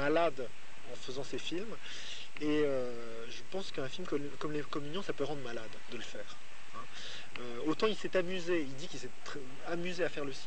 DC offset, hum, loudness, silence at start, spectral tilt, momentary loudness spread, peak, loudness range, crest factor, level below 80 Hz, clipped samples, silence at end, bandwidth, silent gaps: 2%; none; -38 LUFS; 0 s; -4.5 dB/octave; 13 LU; -16 dBFS; 4 LU; 20 dB; -68 dBFS; under 0.1%; 0 s; 9 kHz; none